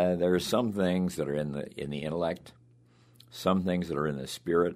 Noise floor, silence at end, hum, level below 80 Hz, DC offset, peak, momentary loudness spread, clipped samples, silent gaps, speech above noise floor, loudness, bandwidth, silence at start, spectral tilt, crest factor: -60 dBFS; 0 s; none; -58 dBFS; under 0.1%; -10 dBFS; 9 LU; under 0.1%; none; 31 dB; -30 LUFS; 15.5 kHz; 0 s; -6 dB/octave; 20 dB